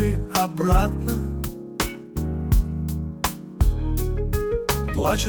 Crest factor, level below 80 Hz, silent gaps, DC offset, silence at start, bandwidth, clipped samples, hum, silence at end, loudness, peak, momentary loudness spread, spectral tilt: 16 dB; -26 dBFS; none; under 0.1%; 0 s; 19.5 kHz; under 0.1%; none; 0 s; -25 LUFS; -6 dBFS; 8 LU; -5.5 dB/octave